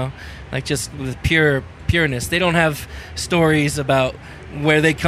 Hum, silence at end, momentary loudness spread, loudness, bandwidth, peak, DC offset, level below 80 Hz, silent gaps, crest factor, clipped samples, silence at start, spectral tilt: none; 0 s; 13 LU; -18 LUFS; 15.5 kHz; 0 dBFS; under 0.1%; -36 dBFS; none; 18 dB; under 0.1%; 0 s; -5 dB/octave